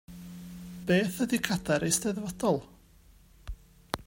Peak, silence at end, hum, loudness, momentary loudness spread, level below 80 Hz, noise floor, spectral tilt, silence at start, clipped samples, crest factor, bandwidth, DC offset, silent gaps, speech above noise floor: -8 dBFS; 0.05 s; none; -29 LUFS; 21 LU; -52 dBFS; -58 dBFS; -4.5 dB/octave; 0.1 s; under 0.1%; 24 dB; 16.5 kHz; under 0.1%; none; 29 dB